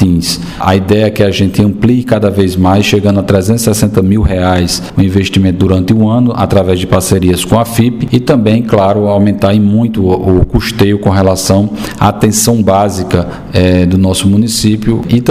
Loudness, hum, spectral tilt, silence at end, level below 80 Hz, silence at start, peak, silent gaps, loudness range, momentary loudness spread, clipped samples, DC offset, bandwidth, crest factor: -10 LUFS; none; -6 dB/octave; 0 s; -28 dBFS; 0 s; 0 dBFS; none; 0 LU; 3 LU; 0.4%; 0.8%; 16 kHz; 8 dB